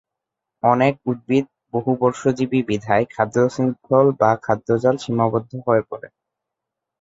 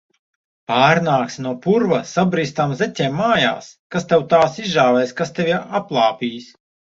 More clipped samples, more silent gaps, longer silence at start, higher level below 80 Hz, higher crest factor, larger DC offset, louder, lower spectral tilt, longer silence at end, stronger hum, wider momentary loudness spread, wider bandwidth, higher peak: neither; second, none vs 3.79-3.90 s; about the same, 0.65 s vs 0.7 s; about the same, -56 dBFS vs -58 dBFS; about the same, 18 dB vs 18 dB; neither; about the same, -20 LUFS vs -18 LUFS; first, -7.5 dB/octave vs -5.5 dB/octave; first, 0.95 s vs 0.5 s; neither; second, 7 LU vs 12 LU; about the same, 7.8 kHz vs 7.8 kHz; about the same, -2 dBFS vs -2 dBFS